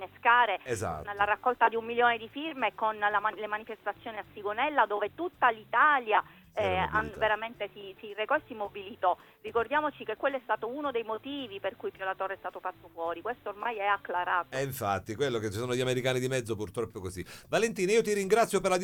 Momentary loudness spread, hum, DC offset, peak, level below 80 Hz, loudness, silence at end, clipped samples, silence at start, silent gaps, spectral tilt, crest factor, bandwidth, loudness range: 12 LU; none; under 0.1%; -10 dBFS; -60 dBFS; -30 LUFS; 0 s; under 0.1%; 0 s; none; -4 dB/octave; 20 dB; 19 kHz; 6 LU